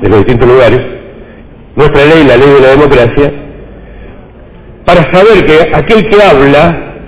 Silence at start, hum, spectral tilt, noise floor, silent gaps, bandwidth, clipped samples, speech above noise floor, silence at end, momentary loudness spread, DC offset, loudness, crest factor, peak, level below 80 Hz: 0 s; none; -10.5 dB/octave; -30 dBFS; none; 4 kHz; 20%; 27 dB; 0 s; 9 LU; 0.8%; -4 LUFS; 6 dB; 0 dBFS; -24 dBFS